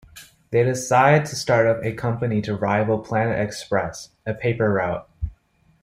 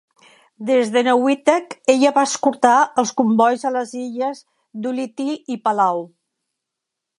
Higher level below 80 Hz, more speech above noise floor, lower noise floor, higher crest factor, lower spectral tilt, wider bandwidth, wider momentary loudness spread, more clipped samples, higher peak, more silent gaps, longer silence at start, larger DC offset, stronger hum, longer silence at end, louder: first, -44 dBFS vs -74 dBFS; second, 38 dB vs 64 dB; second, -59 dBFS vs -82 dBFS; about the same, 18 dB vs 18 dB; first, -6 dB/octave vs -4 dB/octave; first, 15.5 kHz vs 11.5 kHz; about the same, 14 LU vs 12 LU; neither; second, -4 dBFS vs 0 dBFS; neither; second, 0.15 s vs 0.6 s; neither; neither; second, 0.5 s vs 1.15 s; second, -21 LUFS vs -18 LUFS